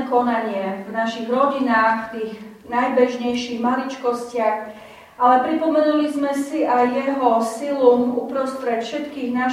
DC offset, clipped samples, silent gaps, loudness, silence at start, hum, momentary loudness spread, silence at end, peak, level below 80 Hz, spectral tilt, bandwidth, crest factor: under 0.1%; under 0.1%; none; -20 LUFS; 0 s; none; 9 LU; 0 s; -2 dBFS; -64 dBFS; -5 dB/octave; 15 kHz; 18 dB